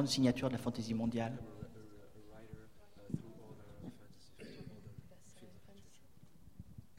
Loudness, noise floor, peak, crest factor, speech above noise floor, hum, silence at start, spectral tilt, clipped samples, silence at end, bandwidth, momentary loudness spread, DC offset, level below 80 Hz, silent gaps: -39 LUFS; -64 dBFS; -20 dBFS; 22 dB; 28 dB; none; 0 s; -5.5 dB/octave; under 0.1%; 0.25 s; 16 kHz; 24 LU; 0.1%; -64 dBFS; none